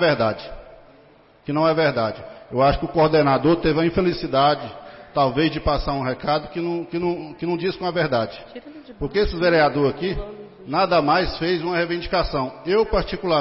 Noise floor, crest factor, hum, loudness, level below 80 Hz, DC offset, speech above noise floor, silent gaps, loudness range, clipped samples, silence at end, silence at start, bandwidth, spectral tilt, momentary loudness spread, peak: -52 dBFS; 14 dB; none; -21 LUFS; -38 dBFS; under 0.1%; 31 dB; none; 4 LU; under 0.1%; 0 s; 0 s; 5.8 kHz; -10 dB/octave; 14 LU; -8 dBFS